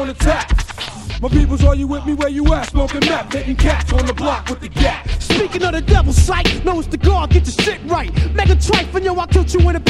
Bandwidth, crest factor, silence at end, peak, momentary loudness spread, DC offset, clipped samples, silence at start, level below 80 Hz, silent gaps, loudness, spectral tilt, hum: 12 kHz; 14 dB; 0 s; 0 dBFS; 7 LU; under 0.1%; under 0.1%; 0 s; -18 dBFS; none; -16 LUFS; -5.5 dB/octave; none